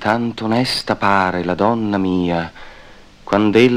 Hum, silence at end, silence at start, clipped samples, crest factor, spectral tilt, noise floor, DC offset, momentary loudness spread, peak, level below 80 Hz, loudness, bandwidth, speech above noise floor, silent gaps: none; 0 s; 0 s; under 0.1%; 16 dB; -6 dB/octave; -41 dBFS; 0.2%; 5 LU; 0 dBFS; -46 dBFS; -17 LUFS; 15.5 kHz; 25 dB; none